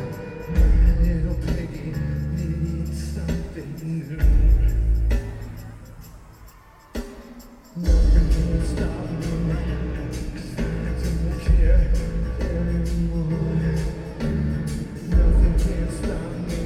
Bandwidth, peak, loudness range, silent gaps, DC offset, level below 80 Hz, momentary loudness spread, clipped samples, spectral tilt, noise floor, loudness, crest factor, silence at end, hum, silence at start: 12.5 kHz; -6 dBFS; 3 LU; none; under 0.1%; -22 dBFS; 15 LU; under 0.1%; -7.5 dB/octave; -47 dBFS; -24 LUFS; 16 dB; 0 s; none; 0 s